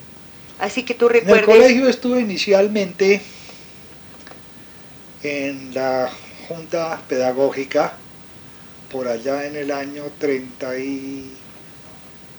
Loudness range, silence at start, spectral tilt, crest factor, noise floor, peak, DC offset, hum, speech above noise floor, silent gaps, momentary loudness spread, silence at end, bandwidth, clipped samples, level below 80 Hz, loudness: 11 LU; 0 s; -4.5 dB/octave; 18 dB; -41 dBFS; -2 dBFS; under 0.1%; none; 23 dB; none; 26 LU; 0 s; over 20 kHz; under 0.1%; -58 dBFS; -18 LUFS